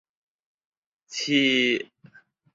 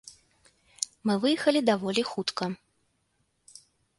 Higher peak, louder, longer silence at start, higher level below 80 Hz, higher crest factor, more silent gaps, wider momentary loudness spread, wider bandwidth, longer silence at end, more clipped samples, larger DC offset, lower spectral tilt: about the same, -8 dBFS vs -6 dBFS; first, -22 LUFS vs -27 LUFS; first, 1.1 s vs 0.05 s; about the same, -72 dBFS vs -72 dBFS; about the same, 20 dB vs 24 dB; neither; first, 16 LU vs 11 LU; second, 7.8 kHz vs 11.5 kHz; second, 0.7 s vs 1.45 s; neither; neither; about the same, -3 dB/octave vs -4 dB/octave